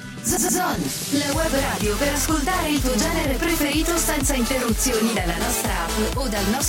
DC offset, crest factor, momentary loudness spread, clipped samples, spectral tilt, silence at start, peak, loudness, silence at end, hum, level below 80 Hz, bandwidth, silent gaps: under 0.1%; 12 dB; 3 LU; under 0.1%; -3.5 dB/octave; 0 s; -8 dBFS; -21 LUFS; 0 s; none; -30 dBFS; 17 kHz; none